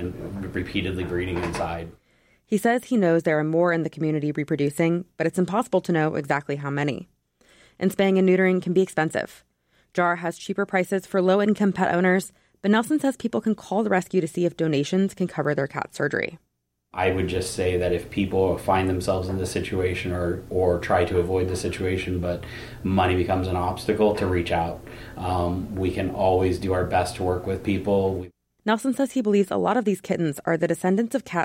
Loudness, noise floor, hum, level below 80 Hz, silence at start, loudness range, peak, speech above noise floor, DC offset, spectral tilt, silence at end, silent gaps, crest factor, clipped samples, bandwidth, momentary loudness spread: -24 LUFS; -58 dBFS; none; -48 dBFS; 0 s; 2 LU; -8 dBFS; 35 dB; under 0.1%; -6.5 dB/octave; 0 s; none; 14 dB; under 0.1%; 16.5 kHz; 7 LU